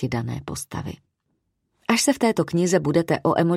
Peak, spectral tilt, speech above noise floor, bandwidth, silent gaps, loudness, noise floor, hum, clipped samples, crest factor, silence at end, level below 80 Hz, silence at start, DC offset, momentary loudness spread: -4 dBFS; -5 dB/octave; 52 dB; 15.5 kHz; none; -22 LUFS; -74 dBFS; none; under 0.1%; 20 dB; 0 s; -52 dBFS; 0 s; under 0.1%; 12 LU